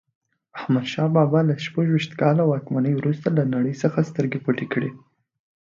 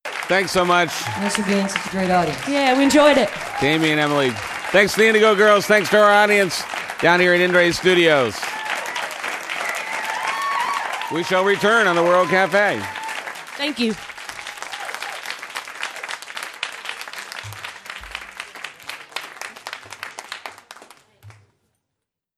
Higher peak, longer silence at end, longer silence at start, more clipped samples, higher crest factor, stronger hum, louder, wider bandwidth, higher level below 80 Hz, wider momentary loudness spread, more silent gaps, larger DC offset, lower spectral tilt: about the same, -4 dBFS vs -2 dBFS; second, 0.7 s vs 1.05 s; first, 0.55 s vs 0.05 s; neither; about the same, 18 dB vs 18 dB; neither; second, -22 LUFS vs -18 LUFS; second, 7.4 kHz vs 14.5 kHz; second, -66 dBFS vs -56 dBFS; second, 7 LU vs 19 LU; neither; neither; first, -8 dB/octave vs -4 dB/octave